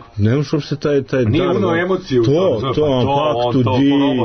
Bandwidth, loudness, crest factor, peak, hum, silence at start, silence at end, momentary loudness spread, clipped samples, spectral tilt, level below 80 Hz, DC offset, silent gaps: 6.6 kHz; -16 LUFS; 10 dB; -6 dBFS; none; 0 s; 0 s; 4 LU; under 0.1%; -7.5 dB/octave; -42 dBFS; under 0.1%; none